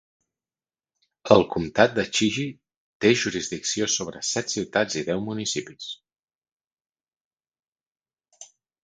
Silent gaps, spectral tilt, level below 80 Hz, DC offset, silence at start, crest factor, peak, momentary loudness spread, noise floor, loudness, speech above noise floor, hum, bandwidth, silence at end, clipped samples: 2.77-3.00 s, 6.19-6.23 s, 6.35-6.42 s, 6.52-6.60 s, 6.67-6.93 s, 7.17-7.31 s, 7.68-7.72 s, 7.87-7.95 s; -3.5 dB/octave; -58 dBFS; under 0.1%; 1.25 s; 26 dB; 0 dBFS; 15 LU; under -90 dBFS; -23 LUFS; over 66 dB; none; 10 kHz; 0.4 s; under 0.1%